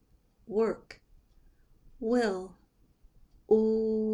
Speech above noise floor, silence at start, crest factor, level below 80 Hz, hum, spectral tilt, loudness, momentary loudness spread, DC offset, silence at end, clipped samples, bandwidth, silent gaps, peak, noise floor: 34 dB; 0.5 s; 20 dB; -60 dBFS; none; -6.5 dB/octave; -30 LUFS; 14 LU; under 0.1%; 0 s; under 0.1%; 11 kHz; none; -12 dBFS; -62 dBFS